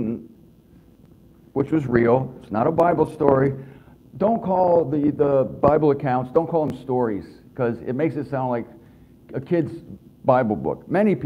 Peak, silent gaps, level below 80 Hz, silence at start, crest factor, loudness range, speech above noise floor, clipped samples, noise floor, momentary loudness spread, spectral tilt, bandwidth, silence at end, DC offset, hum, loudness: 0 dBFS; none; -52 dBFS; 0 s; 22 dB; 6 LU; 31 dB; under 0.1%; -51 dBFS; 12 LU; -10 dB/octave; 11 kHz; 0 s; under 0.1%; none; -21 LUFS